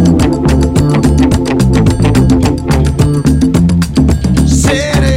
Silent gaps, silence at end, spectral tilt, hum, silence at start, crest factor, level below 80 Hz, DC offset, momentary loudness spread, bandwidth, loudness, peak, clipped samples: none; 0 s; -6.5 dB/octave; none; 0 s; 8 dB; -16 dBFS; under 0.1%; 2 LU; 16 kHz; -10 LUFS; 0 dBFS; 0.2%